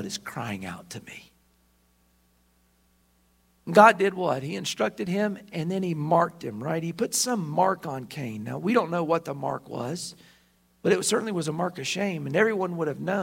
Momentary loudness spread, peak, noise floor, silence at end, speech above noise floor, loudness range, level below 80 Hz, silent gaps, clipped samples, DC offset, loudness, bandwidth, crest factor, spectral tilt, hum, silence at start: 12 LU; 0 dBFS; -65 dBFS; 0 s; 39 dB; 6 LU; -68 dBFS; none; under 0.1%; under 0.1%; -26 LUFS; 16 kHz; 26 dB; -4.5 dB/octave; none; 0 s